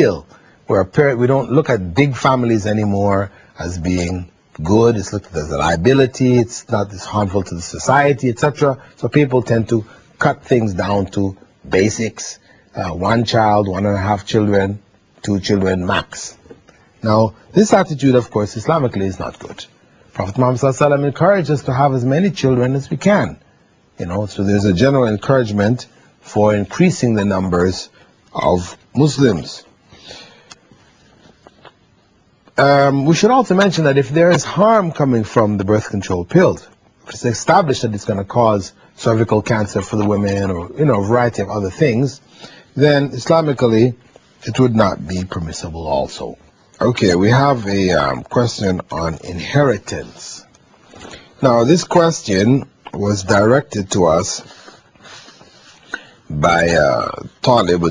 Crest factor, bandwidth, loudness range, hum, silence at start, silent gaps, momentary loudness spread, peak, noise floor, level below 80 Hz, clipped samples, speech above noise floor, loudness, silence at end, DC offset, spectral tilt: 16 dB; 10 kHz; 4 LU; none; 0 s; none; 15 LU; 0 dBFS; -54 dBFS; -46 dBFS; under 0.1%; 39 dB; -16 LUFS; 0 s; under 0.1%; -6 dB/octave